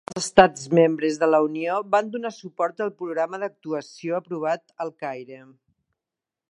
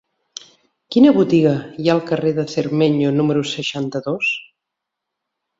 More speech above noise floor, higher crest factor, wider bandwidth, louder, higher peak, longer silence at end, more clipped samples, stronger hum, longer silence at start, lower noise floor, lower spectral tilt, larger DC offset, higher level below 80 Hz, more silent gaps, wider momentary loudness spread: about the same, 65 dB vs 64 dB; first, 24 dB vs 18 dB; first, 11.5 kHz vs 7.8 kHz; second, -23 LUFS vs -17 LUFS; about the same, 0 dBFS vs -2 dBFS; about the same, 1.1 s vs 1.15 s; neither; neither; second, 0.1 s vs 0.9 s; first, -88 dBFS vs -81 dBFS; second, -5 dB/octave vs -6.5 dB/octave; neither; about the same, -60 dBFS vs -60 dBFS; neither; about the same, 15 LU vs 14 LU